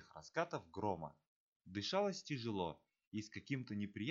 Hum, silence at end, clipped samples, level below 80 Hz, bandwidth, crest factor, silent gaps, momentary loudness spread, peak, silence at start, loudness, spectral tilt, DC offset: none; 0 s; under 0.1%; -76 dBFS; 7.6 kHz; 20 dB; 1.27-1.60 s, 3.07-3.12 s; 10 LU; -24 dBFS; 0 s; -44 LUFS; -4.5 dB/octave; under 0.1%